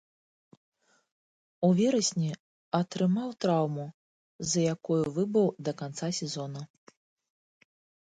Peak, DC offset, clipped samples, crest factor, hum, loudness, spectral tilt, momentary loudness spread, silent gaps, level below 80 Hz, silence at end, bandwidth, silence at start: -12 dBFS; under 0.1%; under 0.1%; 20 dB; none; -29 LUFS; -5.5 dB/octave; 13 LU; 2.40-2.72 s, 3.94-4.39 s; -70 dBFS; 1.35 s; 9.6 kHz; 1.6 s